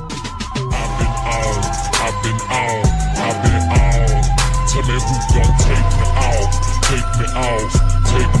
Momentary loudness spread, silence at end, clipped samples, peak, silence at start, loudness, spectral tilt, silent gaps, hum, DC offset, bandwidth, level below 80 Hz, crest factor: 5 LU; 0 s; under 0.1%; -4 dBFS; 0 s; -17 LUFS; -4.5 dB/octave; none; none; under 0.1%; 12.5 kHz; -18 dBFS; 12 dB